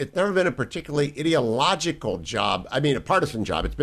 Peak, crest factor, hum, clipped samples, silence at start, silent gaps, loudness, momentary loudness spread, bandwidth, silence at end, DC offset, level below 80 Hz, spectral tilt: -6 dBFS; 18 dB; none; under 0.1%; 0 s; none; -24 LUFS; 6 LU; 14 kHz; 0 s; under 0.1%; -42 dBFS; -5 dB/octave